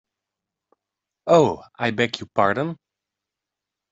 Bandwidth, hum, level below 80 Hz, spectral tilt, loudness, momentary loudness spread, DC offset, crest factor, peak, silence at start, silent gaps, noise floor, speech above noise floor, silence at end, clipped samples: 8 kHz; none; -62 dBFS; -5.5 dB/octave; -21 LUFS; 14 LU; under 0.1%; 20 dB; -4 dBFS; 1.25 s; none; -86 dBFS; 66 dB; 1.15 s; under 0.1%